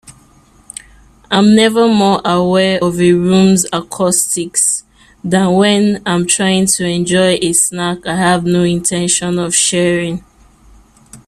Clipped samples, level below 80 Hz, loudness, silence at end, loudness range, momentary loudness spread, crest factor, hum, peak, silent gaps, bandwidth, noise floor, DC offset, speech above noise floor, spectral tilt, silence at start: under 0.1%; -46 dBFS; -12 LUFS; 0.1 s; 2 LU; 8 LU; 14 dB; none; 0 dBFS; none; 15.5 kHz; -47 dBFS; under 0.1%; 35 dB; -4 dB/octave; 0.1 s